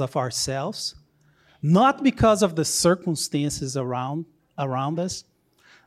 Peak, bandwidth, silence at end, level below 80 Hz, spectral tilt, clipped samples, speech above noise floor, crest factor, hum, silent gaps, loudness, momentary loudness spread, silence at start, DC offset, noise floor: -6 dBFS; 15 kHz; 0.65 s; -48 dBFS; -5 dB/octave; under 0.1%; 37 dB; 18 dB; none; none; -23 LUFS; 12 LU; 0 s; under 0.1%; -60 dBFS